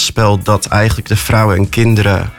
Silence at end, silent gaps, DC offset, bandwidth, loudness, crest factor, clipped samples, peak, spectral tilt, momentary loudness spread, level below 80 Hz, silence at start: 0 s; none; under 0.1%; 17 kHz; -12 LUFS; 10 dB; under 0.1%; 0 dBFS; -5 dB/octave; 3 LU; -28 dBFS; 0 s